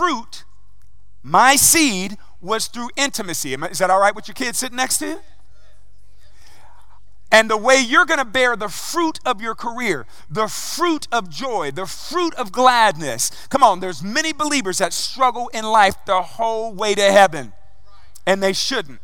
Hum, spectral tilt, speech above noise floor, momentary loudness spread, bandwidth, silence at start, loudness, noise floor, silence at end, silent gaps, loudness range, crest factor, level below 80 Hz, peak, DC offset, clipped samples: none; -2 dB/octave; 34 dB; 12 LU; 17.5 kHz; 0 s; -18 LUFS; -53 dBFS; 0.05 s; none; 5 LU; 20 dB; -52 dBFS; 0 dBFS; 3%; under 0.1%